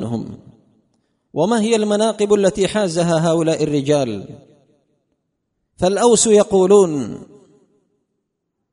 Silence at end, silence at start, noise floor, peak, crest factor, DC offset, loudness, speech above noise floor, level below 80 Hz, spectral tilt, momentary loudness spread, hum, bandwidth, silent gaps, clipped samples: 1.5 s; 0 s; -75 dBFS; 0 dBFS; 18 dB; under 0.1%; -16 LUFS; 59 dB; -52 dBFS; -5 dB/octave; 15 LU; none; 11 kHz; none; under 0.1%